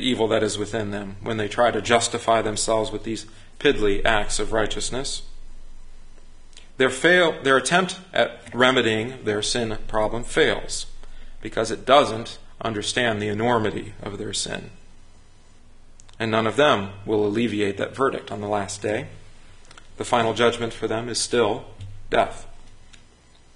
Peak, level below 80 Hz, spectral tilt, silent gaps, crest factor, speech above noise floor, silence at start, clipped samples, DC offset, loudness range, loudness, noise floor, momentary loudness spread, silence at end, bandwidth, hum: 0 dBFS; -42 dBFS; -3.5 dB/octave; none; 22 dB; 29 dB; 0 s; under 0.1%; under 0.1%; 6 LU; -23 LUFS; -51 dBFS; 13 LU; 0.6 s; 11.5 kHz; none